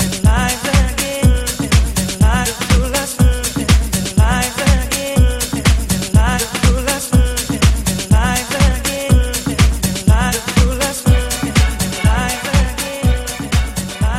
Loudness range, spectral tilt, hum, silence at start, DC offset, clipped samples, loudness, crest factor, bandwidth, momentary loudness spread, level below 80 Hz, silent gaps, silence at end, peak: 1 LU; -4.5 dB/octave; none; 0 s; under 0.1%; under 0.1%; -15 LUFS; 14 dB; 16 kHz; 4 LU; -18 dBFS; none; 0 s; 0 dBFS